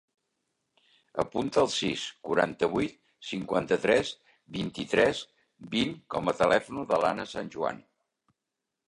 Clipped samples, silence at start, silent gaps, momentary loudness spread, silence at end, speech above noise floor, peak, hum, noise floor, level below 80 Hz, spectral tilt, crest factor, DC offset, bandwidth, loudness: under 0.1%; 1.15 s; none; 12 LU; 1.05 s; 58 dB; -8 dBFS; none; -86 dBFS; -60 dBFS; -4.5 dB/octave; 22 dB; under 0.1%; 11.5 kHz; -29 LUFS